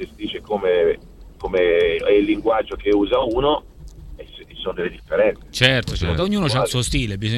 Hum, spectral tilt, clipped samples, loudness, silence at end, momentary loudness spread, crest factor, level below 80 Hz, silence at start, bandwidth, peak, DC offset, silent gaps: none; -5 dB/octave; under 0.1%; -20 LUFS; 0 s; 13 LU; 20 dB; -36 dBFS; 0 s; 14 kHz; 0 dBFS; under 0.1%; none